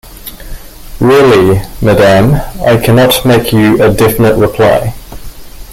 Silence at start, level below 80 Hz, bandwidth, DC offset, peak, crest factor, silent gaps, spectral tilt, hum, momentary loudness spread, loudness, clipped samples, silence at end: 0.05 s; -26 dBFS; 17 kHz; under 0.1%; 0 dBFS; 8 dB; none; -6 dB/octave; none; 11 LU; -8 LUFS; under 0.1%; 0 s